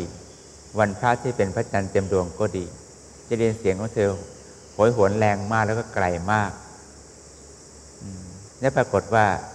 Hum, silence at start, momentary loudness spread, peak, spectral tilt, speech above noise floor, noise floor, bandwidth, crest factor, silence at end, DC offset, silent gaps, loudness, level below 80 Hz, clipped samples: none; 0 s; 24 LU; -4 dBFS; -6 dB/octave; 23 dB; -46 dBFS; 11 kHz; 22 dB; 0 s; under 0.1%; none; -23 LUFS; -50 dBFS; under 0.1%